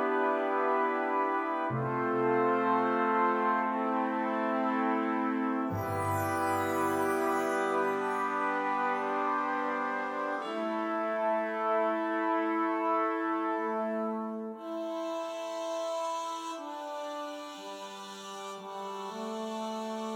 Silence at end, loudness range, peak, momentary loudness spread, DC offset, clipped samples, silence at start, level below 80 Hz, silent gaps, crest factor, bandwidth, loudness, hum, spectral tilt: 0 s; 9 LU; -16 dBFS; 11 LU; under 0.1%; under 0.1%; 0 s; -76 dBFS; none; 14 dB; 18.5 kHz; -31 LUFS; none; -5.5 dB/octave